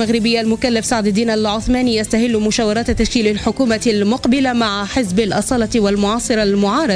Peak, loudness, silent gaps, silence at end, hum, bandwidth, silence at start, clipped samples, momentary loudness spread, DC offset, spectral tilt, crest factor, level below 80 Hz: -4 dBFS; -16 LUFS; none; 0 s; none; 11 kHz; 0 s; under 0.1%; 2 LU; under 0.1%; -4.5 dB/octave; 12 dB; -34 dBFS